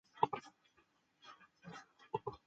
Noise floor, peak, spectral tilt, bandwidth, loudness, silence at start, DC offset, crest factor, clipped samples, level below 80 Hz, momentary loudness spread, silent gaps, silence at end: -76 dBFS; -16 dBFS; -5.5 dB/octave; 8 kHz; -43 LUFS; 0.15 s; under 0.1%; 30 dB; under 0.1%; -78 dBFS; 22 LU; none; 0.1 s